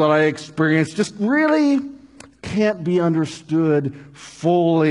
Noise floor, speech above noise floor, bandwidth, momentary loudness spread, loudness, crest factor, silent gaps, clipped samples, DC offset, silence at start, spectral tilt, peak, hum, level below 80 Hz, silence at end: -41 dBFS; 23 dB; 11 kHz; 13 LU; -19 LUFS; 16 dB; none; under 0.1%; under 0.1%; 0 s; -6.5 dB/octave; -4 dBFS; none; -58 dBFS; 0 s